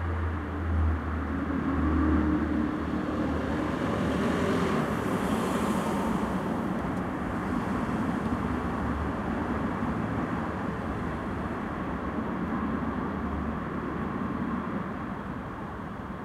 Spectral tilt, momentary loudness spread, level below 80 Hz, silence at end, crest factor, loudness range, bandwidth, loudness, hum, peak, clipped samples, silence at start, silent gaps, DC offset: -7.5 dB/octave; 6 LU; -38 dBFS; 0 s; 14 dB; 4 LU; 14 kHz; -30 LUFS; none; -14 dBFS; under 0.1%; 0 s; none; under 0.1%